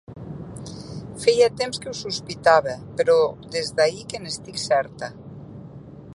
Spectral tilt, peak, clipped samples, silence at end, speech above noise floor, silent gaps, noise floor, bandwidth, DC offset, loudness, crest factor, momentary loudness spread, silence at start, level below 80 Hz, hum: -3.5 dB/octave; -2 dBFS; under 0.1%; 0 s; 19 dB; none; -41 dBFS; 11.5 kHz; under 0.1%; -22 LUFS; 22 dB; 22 LU; 0.1 s; -54 dBFS; none